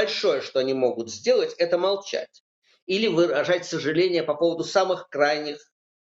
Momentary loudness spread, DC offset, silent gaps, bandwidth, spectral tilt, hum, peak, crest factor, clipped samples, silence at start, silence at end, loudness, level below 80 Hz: 7 LU; under 0.1%; 2.40-2.62 s, 2.82-2.87 s; 8 kHz; -4 dB/octave; none; -6 dBFS; 18 dB; under 0.1%; 0 s; 0.45 s; -24 LUFS; -74 dBFS